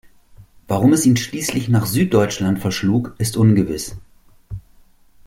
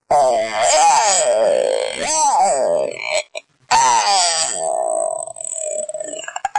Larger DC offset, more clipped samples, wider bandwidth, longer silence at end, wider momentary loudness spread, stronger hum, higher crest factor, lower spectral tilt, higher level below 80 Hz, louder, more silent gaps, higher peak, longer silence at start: neither; neither; first, 16.5 kHz vs 11.5 kHz; first, 0.65 s vs 0 s; first, 17 LU vs 12 LU; neither; about the same, 16 dB vs 14 dB; first, -5.5 dB/octave vs 0 dB/octave; first, -46 dBFS vs -58 dBFS; about the same, -18 LUFS vs -16 LUFS; neither; about the same, -2 dBFS vs -4 dBFS; first, 0.4 s vs 0.1 s